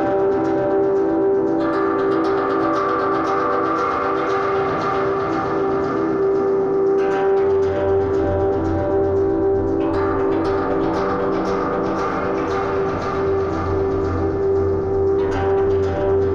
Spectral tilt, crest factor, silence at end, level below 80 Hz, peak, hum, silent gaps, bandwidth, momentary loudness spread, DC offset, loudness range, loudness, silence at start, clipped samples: -8 dB/octave; 10 dB; 0 s; -40 dBFS; -8 dBFS; none; none; 7 kHz; 3 LU; under 0.1%; 2 LU; -19 LUFS; 0 s; under 0.1%